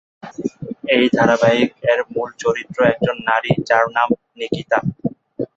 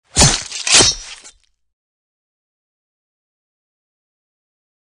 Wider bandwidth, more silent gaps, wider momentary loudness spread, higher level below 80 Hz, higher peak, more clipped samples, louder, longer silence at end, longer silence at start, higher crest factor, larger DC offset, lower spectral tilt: second, 8 kHz vs 11.5 kHz; neither; second, 13 LU vs 17 LU; second, -54 dBFS vs -36 dBFS; about the same, -2 dBFS vs 0 dBFS; neither; second, -18 LUFS vs -11 LUFS; second, 0.1 s vs 3.8 s; about the same, 0.25 s vs 0.15 s; about the same, 16 dB vs 20 dB; neither; first, -6 dB/octave vs -1.5 dB/octave